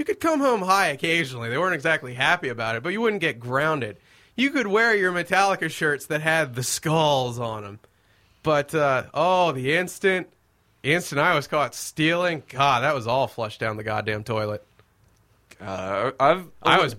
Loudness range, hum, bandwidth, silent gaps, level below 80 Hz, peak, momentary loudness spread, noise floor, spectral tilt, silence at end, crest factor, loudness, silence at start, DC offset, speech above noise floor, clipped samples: 3 LU; none; 16.5 kHz; none; -60 dBFS; -2 dBFS; 8 LU; -63 dBFS; -4 dB/octave; 0 s; 20 dB; -23 LUFS; 0 s; under 0.1%; 40 dB; under 0.1%